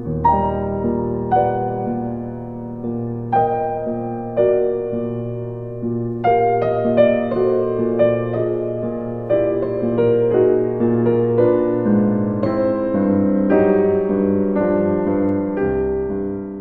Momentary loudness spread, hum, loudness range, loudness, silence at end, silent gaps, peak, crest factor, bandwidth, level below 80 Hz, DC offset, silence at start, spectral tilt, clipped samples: 9 LU; none; 4 LU; -19 LUFS; 0 s; none; -2 dBFS; 16 dB; 4.6 kHz; -42 dBFS; under 0.1%; 0 s; -11.5 dB/octave; under 0.1%